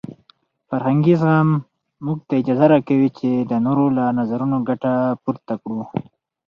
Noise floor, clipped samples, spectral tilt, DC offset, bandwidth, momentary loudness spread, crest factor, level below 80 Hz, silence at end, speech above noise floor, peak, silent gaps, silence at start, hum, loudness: -58 dBFS; under 0.1%; -10.5 dB/octave; under 0.1%; 5.8 kHz; 12 LU; 16 dB; -60 dBFS; 0.45 s; 40 dB; -2 dBFS; none; 0.1 s; none; -19 LUFS